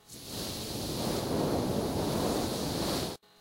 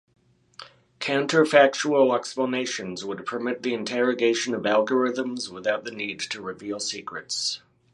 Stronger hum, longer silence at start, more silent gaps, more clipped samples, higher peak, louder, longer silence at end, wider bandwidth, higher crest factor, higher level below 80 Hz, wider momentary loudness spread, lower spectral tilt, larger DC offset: neither; second, 0.1 s vs 0.6 s; neither; neither; second, -18 dBFS vs -2 dBFS; second, -33 LUFS vs -24 LUFS; about the same, 0.25 s vs 0.35 s; first, 16 kHz vs 11.5 kHz; second, 16 dB vs 24 dB; first, -48 dBFS vs -72 dBFS; second, 6 LU vs 13 LU; about the same, -4.5 dB/octave vs -3.5 dB/octave; neither